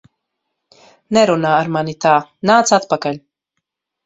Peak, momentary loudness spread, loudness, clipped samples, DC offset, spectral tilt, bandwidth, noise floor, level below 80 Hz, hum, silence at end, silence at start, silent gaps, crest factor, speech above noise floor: 0 dBFS; 8 LU; -15 LUFS; under 0.1%; under 0.1%; -4.5 dB/octave; 8.2 kHz; -76 dBFS; -60 dBFS; none; 0.85 s; 1.1 s; none; 18 dB; 62 dB